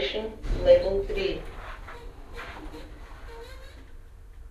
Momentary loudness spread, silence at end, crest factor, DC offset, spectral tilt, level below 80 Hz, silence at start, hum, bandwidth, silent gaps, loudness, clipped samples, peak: 25 LU; 0 s; 22 dB; under 0.1%; -6 dB/octave; -38 dBFS; 0 s; none; 12 kHz; none; -25 LUFS; under 0.1%; -8 dBFS